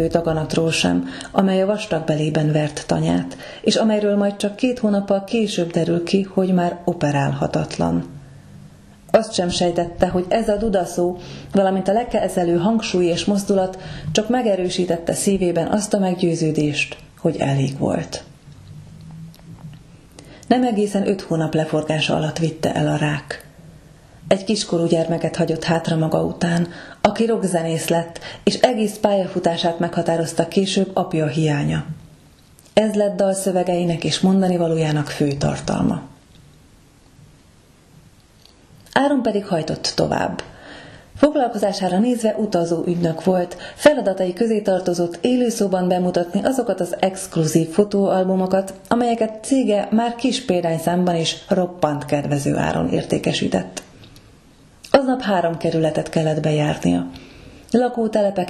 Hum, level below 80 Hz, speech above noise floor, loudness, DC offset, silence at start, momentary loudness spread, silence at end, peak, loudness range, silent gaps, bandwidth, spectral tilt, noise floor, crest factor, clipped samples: none; -48 dBFS; 31 dB; -20 LUFS; under 0.1%; 0 s; 5 LU; 0 s; 0 dBFS; 4 LU; none; 13.5 kHz; -5.5 dB/octave; -50 dBFS; 20 dB; under 0.1%